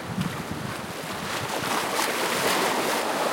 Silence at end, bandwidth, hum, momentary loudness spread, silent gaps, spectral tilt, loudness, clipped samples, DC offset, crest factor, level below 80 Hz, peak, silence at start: 0 s; 17 kHz; none; 9 LU; none; -3 dB/octave; -26 LUFS; under 0.1%; under 0.1%; 18 dB; -58 dBFS; -8 dBFS; 0 s